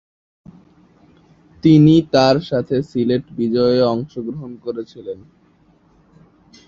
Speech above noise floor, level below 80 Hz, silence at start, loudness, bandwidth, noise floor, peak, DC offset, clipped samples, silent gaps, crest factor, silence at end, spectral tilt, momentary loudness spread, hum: 38 dB; -52 dBFS; 1.65 s; -16 LUFS; 7.4 kHz; -54 dBFS; -2 dBFS; under 0.1%; under 0.1%; none; 18 dB; 1.5 s; -8 dB/octave; 18 LU; none